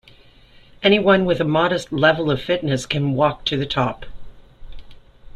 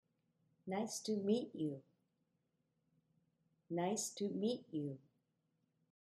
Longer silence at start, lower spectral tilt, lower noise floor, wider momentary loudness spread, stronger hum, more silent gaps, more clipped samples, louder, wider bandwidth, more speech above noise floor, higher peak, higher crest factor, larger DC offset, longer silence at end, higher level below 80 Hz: first, 0.8 s vs 0.65 s; about the same, -6 dB/octave vs -5 dB/octave; second, -48 dBFS vs -84 dBFS; second, 6 LU vs 10 LU; neither; neither; neither; first, -19 LUFS vs -41 LUFS; about the same, 12.5 kHz vs 13.5 kHz; second, 30 dB vs 44 dB; first, -2 dBFS vs -24 dBFS; about the same, 18 dB vs 20 dB; neither; second, 0.05 s vs 1.2 s; first, -44 dBFS vs -88 dBFS